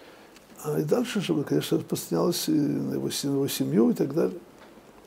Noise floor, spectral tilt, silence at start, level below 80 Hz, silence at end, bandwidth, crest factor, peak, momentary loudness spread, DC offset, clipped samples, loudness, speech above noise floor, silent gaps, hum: -50 dBFS; -5.5 dB/octave; 0 s; -68 dBFS; 0.3 s; 16 kHz; 16 dB; -10 dBFS; 7 LU; under 0.1%; under 0.1%; -26 LUFS; 25 dB; none; none